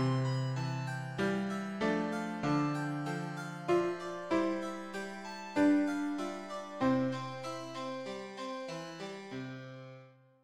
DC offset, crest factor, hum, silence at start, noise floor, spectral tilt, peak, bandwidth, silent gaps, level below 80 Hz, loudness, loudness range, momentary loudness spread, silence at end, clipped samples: under 0.1%; 18 dB; none; 0 s; -57 dBFS; -6.5 dB/octave; -18 dBFS; 13 kHz; none; -70 dBFS; -35 LUFS; 4 LU; 12 LU; 0.3 s; under 0.1%